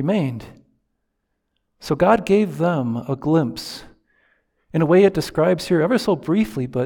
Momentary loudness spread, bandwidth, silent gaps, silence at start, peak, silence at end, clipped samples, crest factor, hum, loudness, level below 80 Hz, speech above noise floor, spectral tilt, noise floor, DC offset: 13 LU; 19 kHz; none; 0 s; -4 dBFS; 0 s; under 0.1%; 18 dB; none; -19 LUFS; -50 dBFS; 55 dB; -7 dB/octave; -74 dBFS; under 0.1%